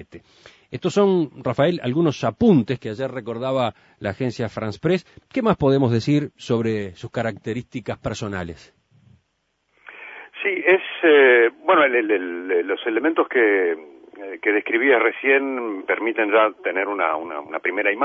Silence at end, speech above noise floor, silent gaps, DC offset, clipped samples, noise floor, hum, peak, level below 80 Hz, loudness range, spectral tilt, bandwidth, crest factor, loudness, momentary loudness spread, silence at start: 0 s; 50 dB; none; under 0.1%; under 0.1%; -71 dBFS; none; -4 dBFS; -54 dBFS; 10 LU; -6.5 dB/octave; 8 kHz; 18 dB; -20 LUFS; 13 LU; 0 s